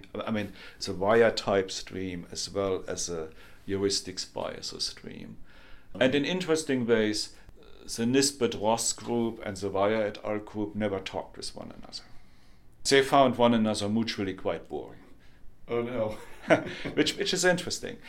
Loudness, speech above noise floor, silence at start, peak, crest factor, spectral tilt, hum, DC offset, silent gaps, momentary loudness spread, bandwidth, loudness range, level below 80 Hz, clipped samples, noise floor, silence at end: -28 LUFS; 22 dB; 0.05 s; -6 dBFS; 24 dB; -4 dB/octave; none; under 0.1%; none; 16 LU; 16.5 kHz; 6 LU; -54 dBFS; under 0.1%; -51 dBFS; 0 s